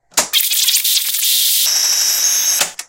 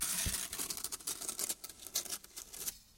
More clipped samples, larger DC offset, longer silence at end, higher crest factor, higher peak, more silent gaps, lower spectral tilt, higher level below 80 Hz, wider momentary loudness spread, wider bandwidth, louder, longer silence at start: neither; neither; about the same, 0.05 s vs 0 s; second, 16 dB vs 24 dB; first, 0 dBFS vs -18 dBFS; neither; second, 3.5 dB/octave vs -0.5 dB/octave; about the same, -60 dBFS vs -56 dBFS; second, 2 LU vs 8 LU; about the same, 17.5 kHz vs 17 kHz; first, -12 LUFS vs -38 LUFS; first, 0.15 s vs 0 s